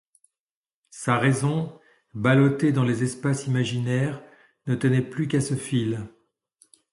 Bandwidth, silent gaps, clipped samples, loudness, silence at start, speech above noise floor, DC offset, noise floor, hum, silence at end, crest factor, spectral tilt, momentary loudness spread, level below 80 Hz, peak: 11.5 kHz; none; under 0.1%; -24 LUFS; 0.95 s; over 67 dB; under 0.1%; under -90 dBFS; none; 0.85 s; 20 dB; -6.5 dB/octave; 14 LU; -60 dBFS; -6 dBFS